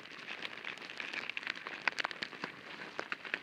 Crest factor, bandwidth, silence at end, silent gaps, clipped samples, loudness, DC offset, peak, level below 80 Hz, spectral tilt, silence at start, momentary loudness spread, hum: 32 dB; 16 kHz; 0 s; none; under 0.1%; -40 LUFS; under 0.1%; -10 dBFS; -86 dBFS; -2 dB/octave; 0 s; 9 LU; none